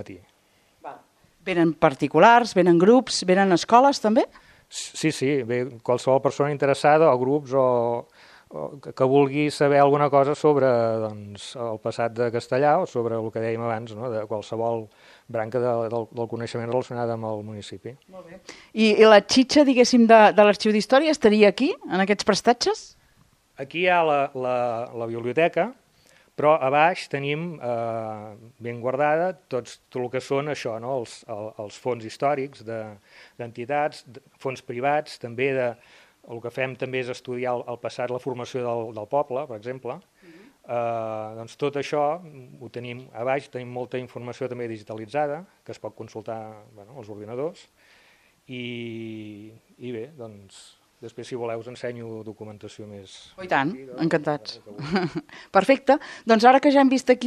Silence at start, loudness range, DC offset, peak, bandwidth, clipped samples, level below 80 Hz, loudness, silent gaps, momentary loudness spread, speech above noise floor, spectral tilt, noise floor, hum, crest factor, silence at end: 0 s; 15 LU; under 0.1%; 0 dBFS; 12.5 kHz; under 0.1%; -66 dBFS; -22 LUFS; none; 20 LU; 39 dB; -5.5 dB/octave; -62 dBFS; none; 22 dB; 0 s